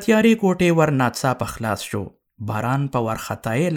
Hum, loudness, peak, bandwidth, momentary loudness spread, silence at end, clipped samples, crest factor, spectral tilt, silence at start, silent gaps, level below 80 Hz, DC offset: none; -21 LUFS; -4 dBFS; 17.5 kHz; 12 LU; 0 s; under 0.1%; 16 dB; -6 dB/octave; 0 s; none; -50 dBFS; under 0.1%